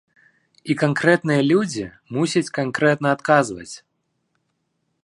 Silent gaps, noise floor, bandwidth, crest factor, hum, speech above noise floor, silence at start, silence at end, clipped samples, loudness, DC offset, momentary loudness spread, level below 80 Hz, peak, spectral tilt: none; -72 dBFS; 11.5 kHz; 20 dB; none; 53 dB; 0.65 s; 1.25 s; under 0.1%; -20 LUFS; under 0.1%; 16 LU; -62 dBFS; 0 dBFS; -5.5 dB/octave